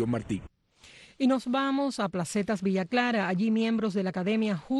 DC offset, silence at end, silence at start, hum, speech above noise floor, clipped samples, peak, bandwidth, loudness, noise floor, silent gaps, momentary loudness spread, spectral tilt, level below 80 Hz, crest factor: under 0.1%; 0 s; 0 s; none; 27 dB; under 0.1%; -12 dBFS; 12 kHz; -28 LUFS; -55 dBFS; none; 4 LU; -6 dB/octave; -60 dBFS; 16 dB